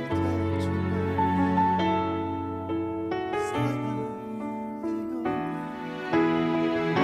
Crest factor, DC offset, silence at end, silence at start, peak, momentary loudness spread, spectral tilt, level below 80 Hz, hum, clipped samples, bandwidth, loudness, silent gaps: 16 dB; under 0.1%; 0 s; 0 s; -12 dBFS; 10 LU; -7.5 dB/octave; -54 dBFS; none; under 0.1%; 12 kHz; -28 LUFS; none